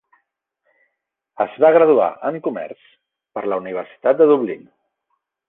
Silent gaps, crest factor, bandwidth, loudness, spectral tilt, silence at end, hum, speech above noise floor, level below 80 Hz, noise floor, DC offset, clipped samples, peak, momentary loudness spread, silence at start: none; 18 dB; 3.9 kHz; -17 LUFS; -9.5 dB/octave; 0.9 s; none; 59 dB; -70 dBFS; -76 dBFS; under 0.1%; under 0.1%; -2 dBFS; 17 LU; 1.4 s